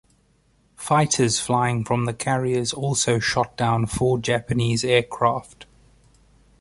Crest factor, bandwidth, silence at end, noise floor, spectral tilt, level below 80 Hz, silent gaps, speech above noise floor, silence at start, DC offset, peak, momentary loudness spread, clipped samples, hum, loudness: 18 dB; 11.5 kHz; 1 s; -61 dBFS; -4.5 dB/octave; -48 dBFS; none; 40 dB; 0.8 s; under 0.1%; -4 dBFS; 4 LU; under 0.1%; none; -22 LUFS